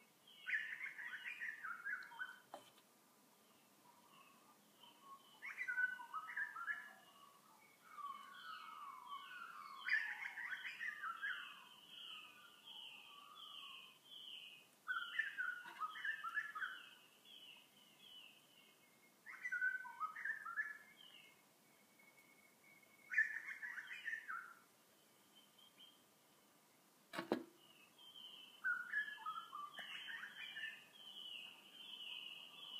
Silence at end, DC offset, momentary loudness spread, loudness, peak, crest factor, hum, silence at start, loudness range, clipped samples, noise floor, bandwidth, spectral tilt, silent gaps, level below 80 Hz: 0 s; under 0.1%; 24 LU; -47 LUFS; -22 dBFS; 28 dB; none; 0 s; 8 LU; under 0.1%; -72 dBFS; 15.5 kHz; -1.5 dB/octave; none; under -90 dBFS